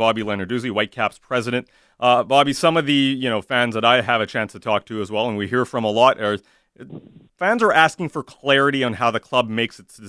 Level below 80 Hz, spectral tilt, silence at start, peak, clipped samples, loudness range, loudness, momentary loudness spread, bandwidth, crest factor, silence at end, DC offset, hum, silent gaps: -60 dBFS; -5 dB/octave; 0 s; 0 dBFS; under 0.1%; 3 LU; -19 LUFS; 10 LU; 11 kHz; 20 dB; 0 s; under 0.1%; none; none